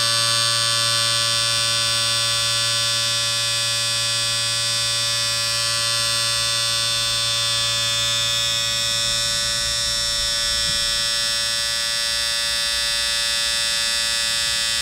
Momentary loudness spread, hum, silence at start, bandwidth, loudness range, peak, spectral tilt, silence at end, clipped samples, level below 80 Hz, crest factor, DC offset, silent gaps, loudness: 2 LU; none; 0 s; 16 kHz; 1 LU; -4 dBFS; 0.5 dB/octave; 0 s; under 0.1%; -46 dBFS; 16 dB; under 0.1%; none; -18 LUFS